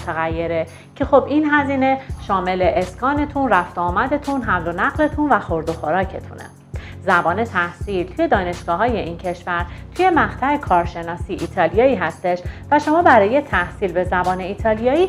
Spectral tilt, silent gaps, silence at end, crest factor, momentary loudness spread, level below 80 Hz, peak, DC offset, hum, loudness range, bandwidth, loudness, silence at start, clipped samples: -6.5 dB/octave; none; 0 s; 18 dB; 11 LU; -36 dBFS; 0 dBFS; under 0.1%; none; 3 LU; 13.5 kHz; -19 LUFS; 0 s; under 0.1%